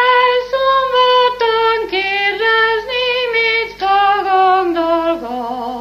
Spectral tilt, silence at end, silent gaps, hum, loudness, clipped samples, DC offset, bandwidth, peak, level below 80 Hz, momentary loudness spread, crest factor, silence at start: -3.5 dB/octave; 0 s; none; 50 Hz at -50 dBFS; -14 LUFS; under 0.1%; under 0.1%; 15 kHz; -2 dBFS; -48 dBFS; 5 LU; 12 dB; 0 s